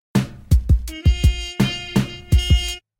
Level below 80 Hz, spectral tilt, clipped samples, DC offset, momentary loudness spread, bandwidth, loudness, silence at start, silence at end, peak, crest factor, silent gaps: -22 dBFS; -5.5 dB/octave; under 0.1%; under 0.1%; 5 LU; 16.5 kHz; -20 LUFS; 0.15 s; 0.2 s; -4 dBFS; 14 dB; none